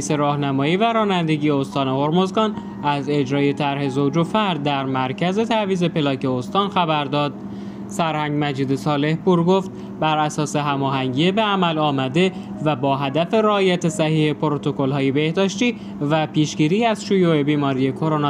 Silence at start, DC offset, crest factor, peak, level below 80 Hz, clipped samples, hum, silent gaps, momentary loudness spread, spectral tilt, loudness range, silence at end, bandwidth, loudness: 0 s; under 0.1%; 16 dB; -4 dBFS; -58 dBFS; under 0.1%; none; none; 5 LU; -6 dB/octave; 2 LU; 0 s; 12 kHz; -20 LUFS